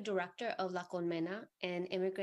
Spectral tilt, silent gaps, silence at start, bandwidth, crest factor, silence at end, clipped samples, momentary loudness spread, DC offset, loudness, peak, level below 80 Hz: -6 dB/octave; none; 0 s; 9.4 kHz; 18 dB; 0 s; under 0.1%; 4 LU; under 0.1%; -40 LUFS; -22 dBFS; -88 dBFS